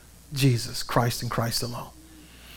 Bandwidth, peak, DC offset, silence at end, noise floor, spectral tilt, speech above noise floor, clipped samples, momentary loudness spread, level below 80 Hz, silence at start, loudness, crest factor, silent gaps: 17.5 kHz; -6 dBFS; under 0.1%; 0 s; -48 dBFS; -5 dB/octave; 22 dB; under 0.1%; 13 LU; -46 dBFS; 0.15 s; -26 LUFS; 22 dB; none